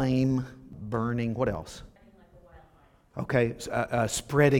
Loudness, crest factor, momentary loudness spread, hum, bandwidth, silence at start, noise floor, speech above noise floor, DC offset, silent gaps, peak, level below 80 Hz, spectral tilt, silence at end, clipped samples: -29 LUFS; 20 dB; 17 LU; none; 16.5 kHz; 0 s; -60 dBFS; 33 dB; under 0.1%; none; -8 dBFS; -50 dBFS; -6 dB/octave; 0 s; under 0.1%